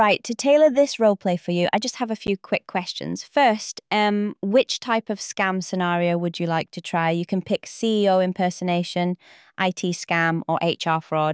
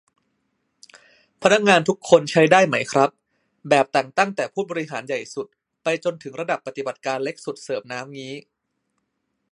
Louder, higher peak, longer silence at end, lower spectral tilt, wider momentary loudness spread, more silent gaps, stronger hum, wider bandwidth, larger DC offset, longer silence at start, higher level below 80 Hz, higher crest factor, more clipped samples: about the same, -22 LUFS vs -21 LUFS; second, -8 dBFS vs 0 dBFS; second, 0 s vs 1.15 s; about the same, -5 dB/octave vs -4.5 dB/octave; second, 8 LU vs 18 LU; neither; neither; second, 8 kHz vs 11.5 kHz; neither; second, 0 s vs 1.4 s; about the same, -64 dBFS vs -68 dBFS; second, 14 dB vs 22 dB; neither